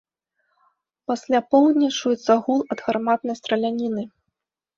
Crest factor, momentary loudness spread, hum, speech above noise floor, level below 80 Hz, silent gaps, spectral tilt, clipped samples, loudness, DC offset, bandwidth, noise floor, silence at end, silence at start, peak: 18 dB; 12 LU; none; 60 dB; -68 dBFS; none; -4.5 dB/octave; under 0.1%; -21 LUFS; under 0.1%; 7.6 kHz; -80 dBFS; 0.7 s; 1.1 s; -4 dBFS